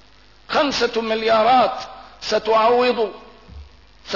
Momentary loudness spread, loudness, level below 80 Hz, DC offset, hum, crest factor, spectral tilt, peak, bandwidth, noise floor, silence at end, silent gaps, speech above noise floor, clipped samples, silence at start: 12 LU; -18 LUFS; -50 dBFS; 0.2%; none; 12 dB; -3.5 dB/octave; -8 dBFS; 6 kHz; -49 dBFS; 0 s; none; 31 dB; under 0.1%; 0.5 s